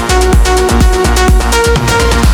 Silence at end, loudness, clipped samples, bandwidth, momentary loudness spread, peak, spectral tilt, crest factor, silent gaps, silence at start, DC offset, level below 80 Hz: 0 s; -9 LUFS; under 0.1%; 19 kHz; 1 LU; 0 dBFS; -4.5 dB/octave; 8 dB; none; 0 s; under 0.1%; -10 dBFS